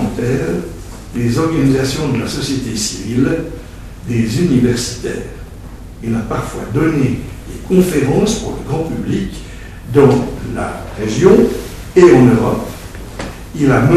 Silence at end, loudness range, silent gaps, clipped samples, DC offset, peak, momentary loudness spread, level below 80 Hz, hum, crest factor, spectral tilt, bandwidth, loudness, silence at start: 0 s; 6 LU; none; 0.2%; under 0.1%; 0 dBFS; 20 LU; -32 dBFS; none; 14 dB; -6 dB/octave; 14 kHz; -15 LUFS; 0 s